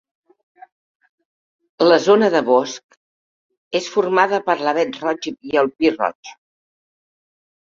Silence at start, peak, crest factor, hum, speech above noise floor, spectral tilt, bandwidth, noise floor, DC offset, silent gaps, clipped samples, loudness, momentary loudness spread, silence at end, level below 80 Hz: 1.8 s; -2 dBFS; 18 dB; none; over 73 dB; -4.5 dB/octave; 7.6 kHz; under -90 dBFS; under 0.1%; 2.84-2.89 s, 2.97-3.50 s, 3.57-3.71 s, 6.15-6.23 s; under 0.1%; -18 LUFS; 11 LU; 1.4 s; -66 dBFS